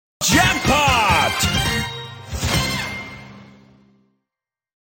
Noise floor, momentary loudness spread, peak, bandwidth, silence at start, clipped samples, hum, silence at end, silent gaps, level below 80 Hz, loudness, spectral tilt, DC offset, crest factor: -87 dBFS; 17 LU; -2 dBFS; 17 kHz; 0.2 s; under 0.1%; none; 1.45 s; none; -34 dBFS; -17 LUFS; -3 dB/octave; under 0.1%; 18 dB